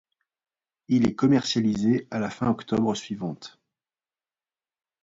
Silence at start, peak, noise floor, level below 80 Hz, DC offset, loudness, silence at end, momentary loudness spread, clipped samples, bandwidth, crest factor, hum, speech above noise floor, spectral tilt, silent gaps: 0.9 s; -10 dBFS; under -90 dBFS; -60 dBFS; under 0.1%; -25 LUFS; 1.55 s; 12 LU; under 0.1%; 8 kHz; 16 dB; none; over 66 dB; -6 dB/octave; none